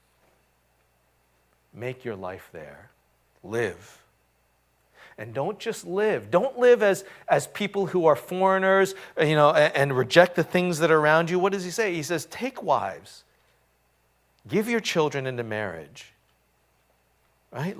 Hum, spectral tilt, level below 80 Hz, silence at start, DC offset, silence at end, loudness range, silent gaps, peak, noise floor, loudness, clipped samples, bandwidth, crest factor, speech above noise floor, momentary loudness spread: 60 Hz at -55 dBFS; -5 dB/octave; -66 dBFS; 1.75 s; under 0.1%; 0 s; 15 LU; none; 0 dBFS; -67 dBFS; -24 LUFS; under 0.1%; 16 kHz; 26 dB; 43 dB; 18 LU